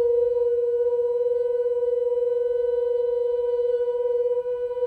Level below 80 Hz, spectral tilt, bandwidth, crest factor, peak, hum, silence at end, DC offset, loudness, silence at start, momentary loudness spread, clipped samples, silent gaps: -60 dBFS; -5.5 dB/octave; 3.2 kHz; 8 dB; -14 dBFS; none; 0 s; under 0.1%; -24 LUFS; 0 s; 2 LU; under 0.1%; none